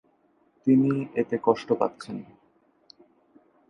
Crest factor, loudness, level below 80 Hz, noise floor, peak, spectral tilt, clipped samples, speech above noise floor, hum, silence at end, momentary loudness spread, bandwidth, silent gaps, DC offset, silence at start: 20 dB; -25 LUFS; -70 dBFS; -65 dBFS; -6 dBFS; -8.5 dB/octave; under 0.1%; 41 dB; none; 1.45 s; 17 LU; 10 kHz; none; under 0.1%; 0.65 s